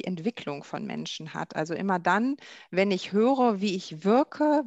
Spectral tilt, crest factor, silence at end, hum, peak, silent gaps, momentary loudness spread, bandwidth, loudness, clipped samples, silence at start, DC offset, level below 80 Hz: -6 dB/octave; 18 dB; 0 s; none; -10 dBFS; none; 12 LU; 8.2 kHz; -27 LUFS; under 0.1%; 0.05 s; under 0.1%; -74 dBFS